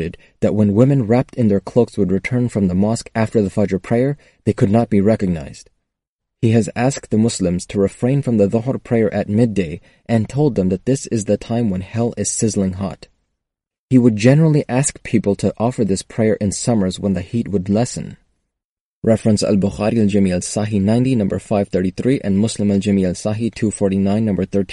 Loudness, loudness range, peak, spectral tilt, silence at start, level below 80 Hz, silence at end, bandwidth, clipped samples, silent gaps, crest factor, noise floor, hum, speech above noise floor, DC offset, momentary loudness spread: -17 LUFS; 3 LU; 0 dBFS; -6.5 dB/octave; 0 s; -46 dBFS; 0 s; 11.5 kHz; under 0.1%; 6.08-6.19 s, 13.79-13.89 s, 18.65-19.02 s; 16 dB; -86 dBFS; none; 69 dB; under 0.1%; 6 LU